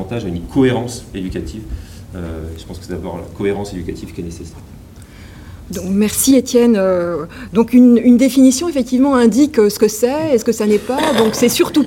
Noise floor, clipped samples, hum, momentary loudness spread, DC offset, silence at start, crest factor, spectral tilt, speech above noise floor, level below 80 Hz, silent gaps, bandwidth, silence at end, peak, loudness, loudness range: -36 dBFS; under 0.1%; none; 18 LU; under 0.1%; 0 s; 14 dB; -5 dB/octave; 22 dB; -38 dBFS; none; 17 kHz; 0 s; 0 dBFS; -14 LUFS; 14 LU